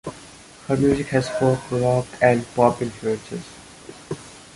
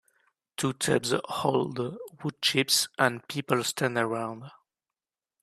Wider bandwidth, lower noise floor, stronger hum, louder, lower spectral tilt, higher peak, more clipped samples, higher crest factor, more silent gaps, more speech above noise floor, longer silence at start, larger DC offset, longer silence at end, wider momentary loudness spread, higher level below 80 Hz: second, 11.5 kHz vs 15 kHz; second, -44 dBFS vs under -90 dBFS; neither; first, -21 LUFS vs -28 LUFS; first, -6.5 dB/octave vs -3.5 dB/octave; first, -2 dBFS vs -6 dBFS; neither; about the same, 20 dB vs 24 dB; neither; second, 24 dB vs over 62 dB; second, 0.05 s vs 0.6 s; neither; second, 0.15 s vs 0.9 s; first, 22 LU vs 13 LU; first, -48 dBFS vs -68 dBFS